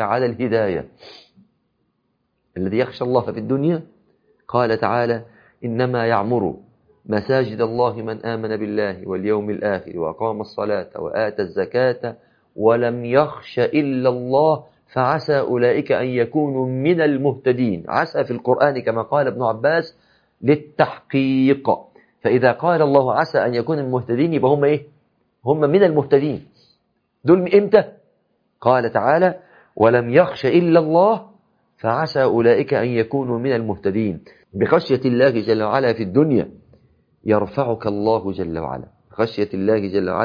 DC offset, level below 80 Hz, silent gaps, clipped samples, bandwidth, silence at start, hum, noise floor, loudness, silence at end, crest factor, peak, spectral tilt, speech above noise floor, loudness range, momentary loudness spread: under 0.1%; -58 dBFS; none; under 0.1%; 5.2 kHz; 0 s; none; -69 dBFS; -19 LUFS; 0 s; 18 dB; 0 dBFS; -9 dB/octave; 51 dB; 5 LU; 10 LU